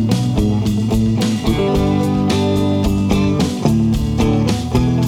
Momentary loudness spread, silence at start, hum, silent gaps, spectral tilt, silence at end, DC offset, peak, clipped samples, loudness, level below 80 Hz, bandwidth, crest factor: 1 LU; 0 s; none; none; -7 dB/octave; 0 s; under 0.1%; 0 dBFS; under 0.1%; -16 LUFS; -26 dBFS; 16.5 kHz; 14 dB